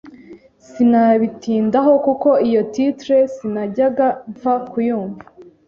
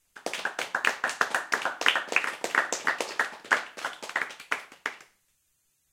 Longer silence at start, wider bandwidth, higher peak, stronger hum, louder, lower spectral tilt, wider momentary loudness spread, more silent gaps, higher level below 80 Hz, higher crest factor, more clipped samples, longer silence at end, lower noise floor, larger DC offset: about the same, 0.05 s vs 0.15 s; second, 7.2 kHz vs 17 kHz; about the same, -2 dBFS vs -2 dBFS; neither; first, -17 LUFS vs -29 LUFS; first, -7.5 dB/octave vs 0 dB/octave; about the same, 9 LU vs 11 LU; neither; first, -60 dBFS vs -80 dBFS; second, 14 dB vs 28 dB; neither; second, 0.25 s vs 0.9 s; second, -42 dBFS vs -72 dBFS; neither